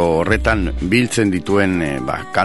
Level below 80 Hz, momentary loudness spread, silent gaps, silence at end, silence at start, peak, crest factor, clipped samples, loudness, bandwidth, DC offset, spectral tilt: -28 dBFS; 5 LU; none; 0 s; 0 s; 0 dBFS; 16 dB; under 0.1%; -17 LUFS; 12 kHz; 1%; -5.5 dB/octave